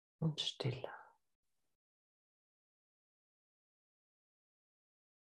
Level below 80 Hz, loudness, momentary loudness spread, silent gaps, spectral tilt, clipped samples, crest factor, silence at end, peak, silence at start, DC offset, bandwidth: -82 dBFS; -41 LUFS; 13 LU; none; -5 dB/octave; under 0.1%; 22 dB; 4.15 s; -26 dBFS; 0.2 s; under 0.1%; 10.5 kHz